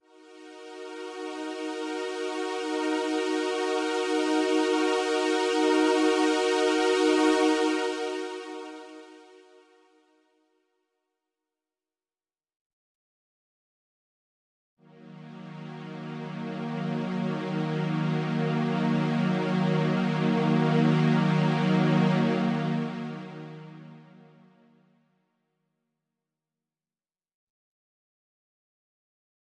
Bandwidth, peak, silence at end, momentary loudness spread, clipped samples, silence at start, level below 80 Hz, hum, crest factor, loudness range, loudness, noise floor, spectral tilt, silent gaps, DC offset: 11.5 kHz; -12 dBFS; 5.5 s; 19 LU; under 0.1%; 0.3 s; -76 dBFS; none; 16 dB; 15 LU; -26 LUFS; under -90 dBFS; -6 dB/octave; 12.56-14.77 s; under 0.1%